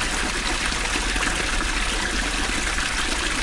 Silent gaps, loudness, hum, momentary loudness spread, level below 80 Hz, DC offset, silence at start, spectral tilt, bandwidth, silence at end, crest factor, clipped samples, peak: none; -23 LUFS; none; 1 LU; -30 dBFS; under 0.1%; 0 s; -2 dB/octave; 11.5 kHz; 0 s; 14 dB; under 0.1%; -8 dBFS